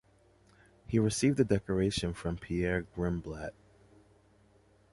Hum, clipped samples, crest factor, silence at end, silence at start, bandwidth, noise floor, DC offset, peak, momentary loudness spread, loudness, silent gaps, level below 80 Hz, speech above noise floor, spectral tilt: none; under 0.1%; 20 dB; 1.4 s; 0.9 s; 11.5 kHz; -64 dBFS; under 0.1%; -14 dBFS; 11 LU; -32 LUFS; none; -50 dBFS; 33 dB; -5.5 dB/octave